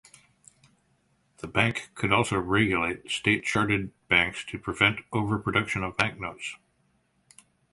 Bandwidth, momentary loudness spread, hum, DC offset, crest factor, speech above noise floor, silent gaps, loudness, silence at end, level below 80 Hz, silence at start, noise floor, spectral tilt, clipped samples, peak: 11.5 kHz; 12 LU; none; under 0.1%; 24 dB; 43 dB; none; -26 LUFS; 1.15 s; -52 dBFS; 1.45 s; -69 dBFS; -4.5 dB/octave; under 0.1%; -4 dBFS